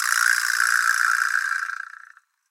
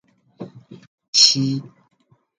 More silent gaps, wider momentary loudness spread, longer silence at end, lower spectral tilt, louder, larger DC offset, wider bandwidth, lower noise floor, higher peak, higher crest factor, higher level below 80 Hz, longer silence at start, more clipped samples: second, none vs 0.87-0.98 s, 1.08-1.13 s; second, 13 LU vs 26 LU; about the same, 0.65 s vs 0.75 s; second, 11 dB/octave vs -2 dB/octave; second, -20 LUFS vs -15 LUFS; neither; first, 17 kHz vs 11 kHz; first, -51 dBFS vs -39 dBFS; about the same, -2 dBFS vs 0 dBFS; about the same, 20 dB vs 22 dB; second, under -90 dBFS vs -70 dBFS; second, 0 s vs 0.4 s; neither